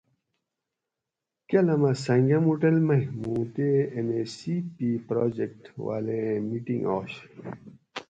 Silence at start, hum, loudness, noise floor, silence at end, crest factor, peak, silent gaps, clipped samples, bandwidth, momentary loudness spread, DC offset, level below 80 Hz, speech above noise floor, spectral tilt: 1.5 s; none; -26 LUFS; -87 dBFS; 0.05 s; 18 dB; -10 dBFS; none; under 0.1%; 9 kHz; 16 LU; under 0.1%; -64 dBFS; 61 dB; -8 dB/octave